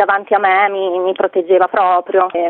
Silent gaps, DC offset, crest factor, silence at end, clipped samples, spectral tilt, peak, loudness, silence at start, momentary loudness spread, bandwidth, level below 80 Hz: none; under 0.1%; 14 dB; 0 s; under 0.1%; -8 dB/octave; 0 dBFS; -14 LUFS; 0 s; 5 LU; 4.2 kHz; -64 dBFS